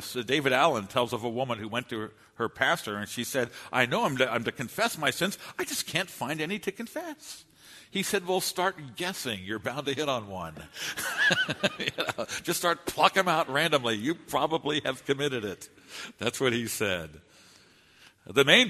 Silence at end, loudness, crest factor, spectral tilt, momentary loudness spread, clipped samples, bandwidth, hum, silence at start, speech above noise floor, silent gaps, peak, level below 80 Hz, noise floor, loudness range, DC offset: 0 s; -28 LUFS; 26 dB; -3 dB/octave; 13 LU; under 0.1%; 13.5 kHz; none; 0 s; 29 dB; none; -4 dBFS; -66 dBFS; -58 dBFS; 5 LU; under 0.1%